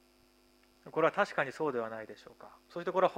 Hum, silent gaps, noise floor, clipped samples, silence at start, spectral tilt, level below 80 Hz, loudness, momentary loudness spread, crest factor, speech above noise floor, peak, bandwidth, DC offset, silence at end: none; none; -66 dBFS; under 0.1%; 0.85 s; -5.5 dB/octave; -76 dBFS; -34 LUFS; 22 LU; 22 dB; 32 dB; -14 dBFS; 15.5 kHz; under 0.1%; 0 s